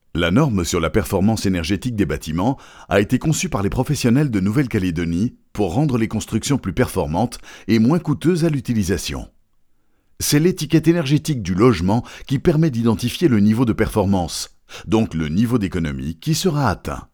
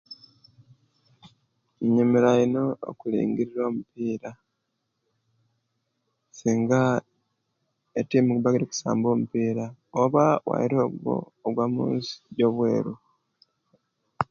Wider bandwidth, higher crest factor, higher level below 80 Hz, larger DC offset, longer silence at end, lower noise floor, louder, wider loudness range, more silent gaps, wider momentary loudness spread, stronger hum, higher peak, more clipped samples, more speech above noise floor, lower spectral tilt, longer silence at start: first, 20 kHz vs 7.2 kHz; about the same, 18 dB vs 22 dB; first, -40 dBFS vs -66 dBFS; neither; about the same, 0.1 s vs 0.05 s; second, -57 dBFS vs -78 dBFS; first, -19 LUFS vs -25 LUFS; second, 3 LU vs 6 LU; neither; second, 8 LU vs 12 LU; neither; first, 0 dBFS vs -4 dBFS; neither; second, 39 dB vs 54 dB; about the same, -6 dB/octave vs -7 dB/octave; about the same, 0.15 s vs 0.1 s